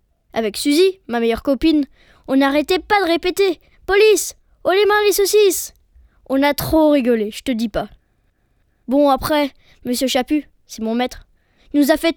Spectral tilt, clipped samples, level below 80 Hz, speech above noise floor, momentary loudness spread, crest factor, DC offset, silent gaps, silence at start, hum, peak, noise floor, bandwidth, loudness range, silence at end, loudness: -3.5 dB/octave; under 0.1%; -42 dBFS; 45 dB; 11 LU; 16 dB; under 0.1%; none; 0.35 s; none; -2 dBFS; -62 dBFS; over 20 kHz; 4 LU; 0.05 s; -17 LUFS